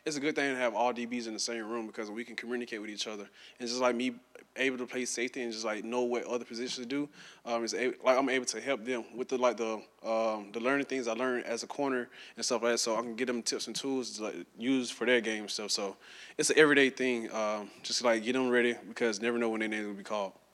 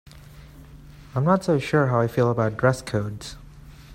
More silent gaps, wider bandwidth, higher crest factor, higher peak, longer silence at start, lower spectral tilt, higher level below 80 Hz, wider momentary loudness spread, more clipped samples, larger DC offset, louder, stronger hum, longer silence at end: neither; second, 13.5 kHz vs 16 kHz; first, 24 dB vs 18 dB; second, -10 dBFS vs -6 dBFS; about the same, 0.05 s vs 0.15 s; second, -2.5 dB/octave vs -7 dB/octave; second, -82 dBFS vs -48 dBFS; second, 10 LU vs 14 LU; neither; neither; second, -32 LUFS vs -23 LUFS; neither; first, 0.2 s vs 0 s